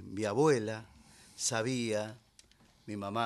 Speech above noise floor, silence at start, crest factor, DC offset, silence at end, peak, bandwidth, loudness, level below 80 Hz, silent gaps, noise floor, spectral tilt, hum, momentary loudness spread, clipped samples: 31 dB; 0 s; 18 dB; under 0.1%; 0 s; -16 dBFS; 13 kHz; -33 LUFS; -70 dBFS; none; -63 dBFS; -4.5 dB/octave; none; 16 LU; under 0.1%